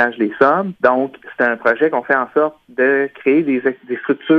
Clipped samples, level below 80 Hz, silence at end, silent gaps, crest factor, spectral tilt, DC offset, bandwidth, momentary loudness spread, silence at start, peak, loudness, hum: under 0.1%; -62 dBFS; 0 s; none; 16 dB; -8 dB/octave; under 0.1%; 5.8 kHz; 6 LU; 0 s; 0 dBFS; -17 LUFS; none